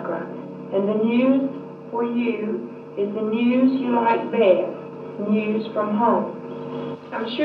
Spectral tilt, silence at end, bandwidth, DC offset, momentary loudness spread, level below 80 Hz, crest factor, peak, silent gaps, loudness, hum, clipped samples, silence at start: -9 dB/octave; 0 s; 5 kHz; under 0.1%; 13 LU; -78 dBFS; 18 dB; -4 dBFS; none; -22 LUFS; none; under 0.1%; 0 s